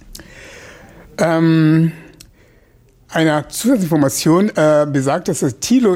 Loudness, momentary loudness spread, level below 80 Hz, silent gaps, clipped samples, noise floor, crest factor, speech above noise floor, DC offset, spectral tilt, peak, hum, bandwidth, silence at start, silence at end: -15 LUFS; 10 LU; -50 dBFS; none; under 0.1%; -50 dBFS; 12 dB; 36 dB; under 0.1%; -6 dB/octave; -4 dBFS; none; 16.5 kHz; 0.1 s; 0 s